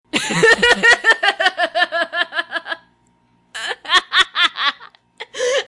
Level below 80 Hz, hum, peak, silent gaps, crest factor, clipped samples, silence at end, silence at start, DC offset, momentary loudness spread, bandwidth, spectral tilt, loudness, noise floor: -52 dBFS; 60 Hz at -65 dBFS; 0 dBFS; none; 18 dB; under 0.1%; 0.05 s; 0.15 s; under 0.1%; 16 LU; 11.5 kHz; -1.5 dB/octave; -15 LUFS; -58 dBFS